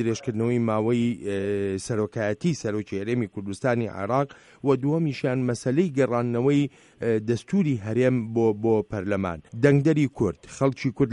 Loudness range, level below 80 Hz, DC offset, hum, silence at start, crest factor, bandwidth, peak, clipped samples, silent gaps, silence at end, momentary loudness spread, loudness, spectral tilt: 3 LU; -58 dBFS; under 0.1%; none; 0 s; 18 dB; 11 kHz; -6 dBFS; under 0.1%; none; 0 s; 6 LU; -25 LUFS; -7.5 dB/octave